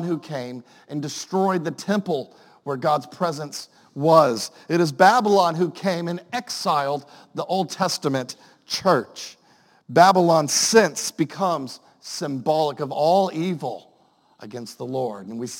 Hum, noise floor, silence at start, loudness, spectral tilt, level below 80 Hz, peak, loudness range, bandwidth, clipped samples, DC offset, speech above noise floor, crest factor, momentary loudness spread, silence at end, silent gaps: none; -59 dBFS; 0 s; -21 LUFS; -4 dB/octave; -72 dBFS; 0 dBFS; 6 LU; 17 kHz; under 0.1%; under 0.1%; 38 dB; 22 dB; 19 LU; 0 s; none